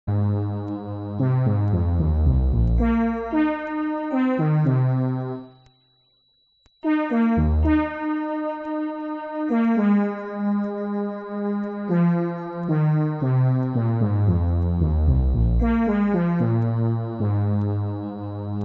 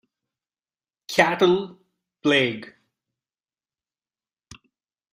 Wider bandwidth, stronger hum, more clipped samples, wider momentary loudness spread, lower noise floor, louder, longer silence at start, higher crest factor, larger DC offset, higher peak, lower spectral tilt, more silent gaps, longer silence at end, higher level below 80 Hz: second, 4.2 kHz vs 15.5 kHz; neither; neither; second, 8 LU vs 14 LU; second, -64 dBFS vs under -90 dBFS; about the same, -23 LUFS vs -21 LUFS; second, 0.05 s vs 1.1 s; second, 12 dB vs 24 dB; neither; second, -10 dBFS vs -2 dBFS; first, -9.5 dB/octave vs -4.5 dB/octave; neither; second, 0 s vs 2.45 s; first, -30 dBFS vs -66 dBFS